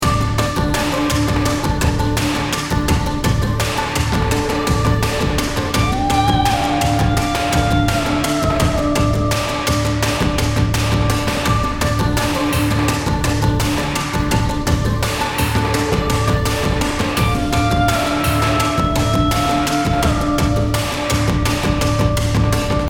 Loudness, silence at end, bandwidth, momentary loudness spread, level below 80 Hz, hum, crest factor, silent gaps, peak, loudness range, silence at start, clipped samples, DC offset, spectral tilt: -17 LUFS; 0 s; 18.5 kHz; 2 LU; -24 dBFS; none; 14 dB; none; -2 dBFS; 1 LU; 0 s; under 0.1%; under 0.1%; -5 dB/octave